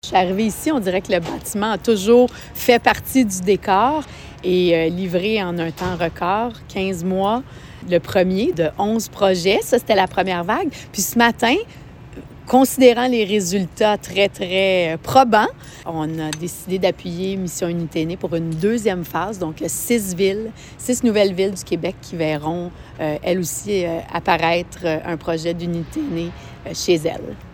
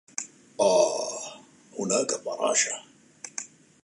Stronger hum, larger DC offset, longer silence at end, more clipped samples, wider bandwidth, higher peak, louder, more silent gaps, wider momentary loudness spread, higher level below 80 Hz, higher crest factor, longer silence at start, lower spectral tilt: neither; neither; second, 0 s vs 0.4 s; neither; first, 17 kHz vs 11.5 kHz; first, 0 dBFS vs -10 dBFS; first, -19 LUFS vs -26 LUFS; neither; second, 10 LU vs 18 LU; first, -44 dBFS vs -78 dBFS; about the same, 18 dB vs 20 dB; second, 0.05 s vs 0.2 s; first, -4.5 dB/octave vs -2 dB/octave